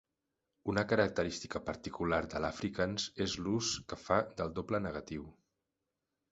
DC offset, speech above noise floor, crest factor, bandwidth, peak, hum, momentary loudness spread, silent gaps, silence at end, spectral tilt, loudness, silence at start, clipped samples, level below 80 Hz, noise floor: under 0.1%; 52 dB; 24 dB; 8 kHz; -14 dBFS; none; 10 LU; none; 1 s; -4 dB/octave; -36 LUFS; 0.65 s; under 0.1%; -56 dBFS; -88 dBFS